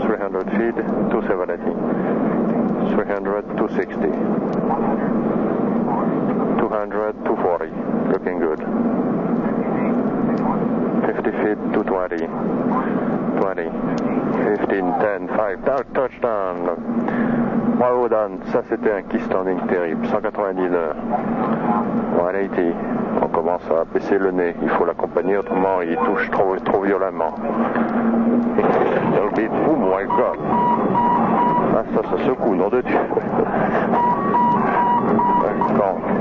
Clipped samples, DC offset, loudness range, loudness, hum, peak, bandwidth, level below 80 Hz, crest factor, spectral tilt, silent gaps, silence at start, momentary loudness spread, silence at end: under 0.1%; under 0.1%; 3 LU; -20 LUFS; none; -4 dBFS; 6.6 kHz; -48 dBFS; 16 dB; -9.5 dB/octave; none; 0 s; 5 LU; 0 s